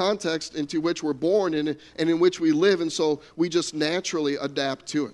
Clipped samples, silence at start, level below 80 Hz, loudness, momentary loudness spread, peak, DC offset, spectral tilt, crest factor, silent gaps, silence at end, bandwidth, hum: under 0.1%; 0 s; -64 dBFS; -25 LUFS; 7 LU; -8 dBFS; under 0.1%; -4.5 dB/octave; 16 dB; none; 0 s; 11.5 kHz; none